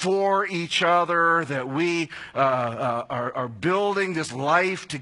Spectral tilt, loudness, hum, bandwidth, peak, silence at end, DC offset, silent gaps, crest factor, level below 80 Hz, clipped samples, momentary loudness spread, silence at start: -4.5 dB/octave; -23 LUFS; none; 11 kHz; -4 dBFS; 0 s; under 0.1%; none; 18 dB; -66 dBFS; under 0.1%; 8 LU; 0 s